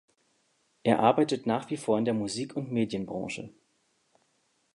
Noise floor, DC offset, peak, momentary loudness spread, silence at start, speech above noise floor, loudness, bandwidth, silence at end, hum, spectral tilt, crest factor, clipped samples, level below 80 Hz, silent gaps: -72 dBFS; under 0.1%; -8 dBFS; 12 LU; 0.85 s; 44 dB; -29 LUFS; 11.5 kHz; 1.25 s; none; -6 dB/octave; 22 dB; under 0.1%; -68 dBFS; none